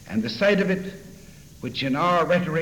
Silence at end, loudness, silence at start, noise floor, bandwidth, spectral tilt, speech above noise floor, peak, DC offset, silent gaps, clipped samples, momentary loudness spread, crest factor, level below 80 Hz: 0 s; -23 LUFS; 0 s; -45 dBFS; 19 kHz; -6 dB/octave; 23 dB; -8 dBFS; under 0.1%; none; under 0.1%; 16 LU; 16 dB; -52 dBFS